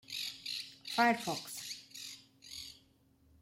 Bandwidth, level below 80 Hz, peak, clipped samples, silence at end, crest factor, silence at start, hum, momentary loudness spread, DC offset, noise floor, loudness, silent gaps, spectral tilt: 16.5 kHz; -76 dBFS; -16 dBFS; under 0.1%; 0.65 s; 22 dB; 0.1 s; none; 18 LU; under 0.1%; -68 dBFS; -37 LUFS; none; -2.5 dB/octave